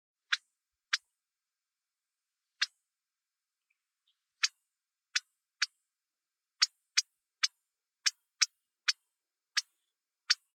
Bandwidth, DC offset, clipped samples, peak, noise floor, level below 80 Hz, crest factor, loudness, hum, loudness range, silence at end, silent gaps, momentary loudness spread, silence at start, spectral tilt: 18 kHz; under 0.1%; under 0.1%; -8 dBFS; under -90 dBFS; under -90 dBFS; 30 dB; -34 LUFS; none; 8 LU; 0.2 s; none; 5 LU; 0.3 s; 11.5 dB/octave